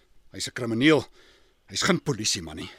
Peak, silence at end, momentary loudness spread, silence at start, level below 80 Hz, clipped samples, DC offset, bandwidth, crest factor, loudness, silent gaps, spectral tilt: -6 dBFS; 0.05 s; 13 LU; 0.35 s; -56 dBFS; under 0.1%; under 0.1%; 16 kHz; 22 dB; -25 LUFS; none; -3.5 dB/octave